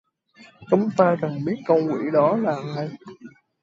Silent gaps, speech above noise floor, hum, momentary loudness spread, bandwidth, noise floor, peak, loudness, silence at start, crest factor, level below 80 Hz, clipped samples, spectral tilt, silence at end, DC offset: none; 31 dB; none; 11 LU; 7.8 kHz; -52 dBFS; -4 dBFS; -22 LUFS; 0.4 s; 18 dB; -68 dBFS; under 0.1%; -8.5 dB/octave; 0.35 s; under 0.1%